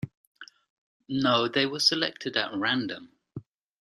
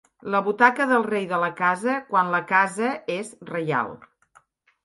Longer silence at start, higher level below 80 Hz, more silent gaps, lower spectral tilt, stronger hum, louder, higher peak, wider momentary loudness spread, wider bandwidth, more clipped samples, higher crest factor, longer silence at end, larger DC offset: second, 0.05 s vs 0.25 s; about the same, -68 dBFS vs -72 dBFS; first, 0.17-0.35 s, 0.70-1.00 s vs none; second, -3.5 dB/octave vs -5 dB/octave; neither; second, -26 LUFS vs -23 LUFS; second, -8 dBFS vs -2 dBFS; first, 22 LU vs 11 LU; first, 13.5 kHz vs 11.5 kHz; neither; about the same, 22 dB vs 22 dB; second, 0.4 s vs 0.9 s; neither